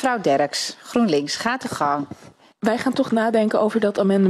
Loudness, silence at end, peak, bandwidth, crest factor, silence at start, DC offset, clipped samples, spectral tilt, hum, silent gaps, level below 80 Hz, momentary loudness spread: -21 LUFS; 0 s; -6 dBFS; 13 kHz; 16 dB; 0 s; under 0.1%; under 0.1%; -5 dB/octave; none; none; -64 dBFS; 6 LU